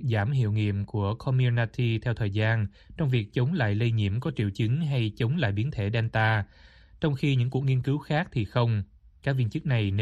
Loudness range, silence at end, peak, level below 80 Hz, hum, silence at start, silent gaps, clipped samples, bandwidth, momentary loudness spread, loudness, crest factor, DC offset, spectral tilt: 1 LU; 0 s; -12 dBFS; -52 dBFS; none; 0 s; none; under 0.1%; 7.6 kHz; 5 LU; -27 LUFS; 14 dB; under 0.1%; -8 dB/octave